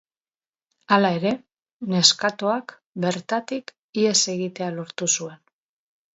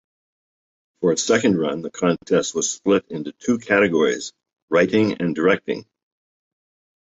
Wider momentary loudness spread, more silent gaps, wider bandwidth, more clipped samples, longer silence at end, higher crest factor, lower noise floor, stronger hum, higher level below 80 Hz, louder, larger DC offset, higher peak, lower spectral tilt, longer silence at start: first, 15 LU vs 10 LU; first, 1.72-1.80 s, 2.86-2.93 s, 3.79-3.93 s vs 4.62-4.68 s; about the same, 8.2 kHz vs 8.2 kHz; neither; second, 0.8 s vs 1.2 s; first, 24 dB vs 18 dB; about the same, under -90 dBFS vs under -90 dBFS; neither; second, -70 dBFS vs -60 dBFS; about the same, -22 LUFS vs -20 LUFS; neither; first, 0 dBFS vs -4 dBFS; second, -3 dB/octave vs -4.5 dB/octave; about the same, 0.9 s vs 1 s